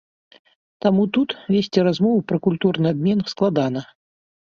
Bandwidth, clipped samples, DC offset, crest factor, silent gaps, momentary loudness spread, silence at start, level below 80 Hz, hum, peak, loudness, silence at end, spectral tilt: 7 kHz; under 0.1%; under 0.1%; 18 dB; none; 4 LU; 0.85 s; -60 dBFS; none; -4 dBFS; -20 LUFS; 0.65 s; -7.5 dB/octave